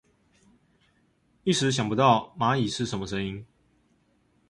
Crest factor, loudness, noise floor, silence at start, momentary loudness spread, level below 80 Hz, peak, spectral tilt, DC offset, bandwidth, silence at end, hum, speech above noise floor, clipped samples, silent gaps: 22 dB; -26 LUFS; -67 dBFS; 1.45 s; 11 LU; -58 dBFS; -6 dBFS; -5 dB/octave; under 0.1%; 11.5 kHz; 1.05 s; none; 42 dB; under 0.1%; none